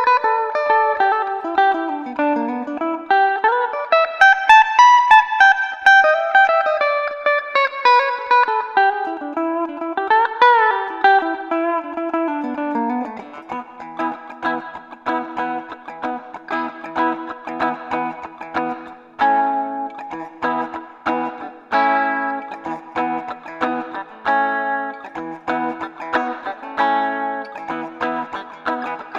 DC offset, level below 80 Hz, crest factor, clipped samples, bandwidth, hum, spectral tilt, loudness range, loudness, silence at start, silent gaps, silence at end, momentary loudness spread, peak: under 0.1%; -64 dBFS; 18 dB; under 0.1%; 9.2 kHz; none; -3.5 dB/octave; 12 LU; -18 LUFS; 0 s; none; 0 s; 16 LU; 0 dBFS